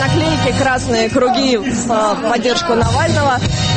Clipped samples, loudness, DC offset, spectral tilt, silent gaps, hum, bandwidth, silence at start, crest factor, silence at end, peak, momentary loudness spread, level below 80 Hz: under 0.1%; -14 LUFS; under 0.1%; -5 dB/octave; none; none; 8.8 kHz; 0 s; 12 dB; 0 s; -2 dBFS; 2 LU; -32 dBFS